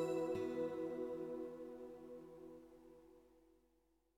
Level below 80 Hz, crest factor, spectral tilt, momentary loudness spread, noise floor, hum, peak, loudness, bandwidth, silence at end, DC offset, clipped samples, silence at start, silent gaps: -78 dBFS; 16 dB; -7 dB/octave; 22 LU; -79 dBFS; none; -30 dBFS; -46 LUFS; 16.5 kHz; 0.75 s; under 0.1%; under 0.1%; 0 s; none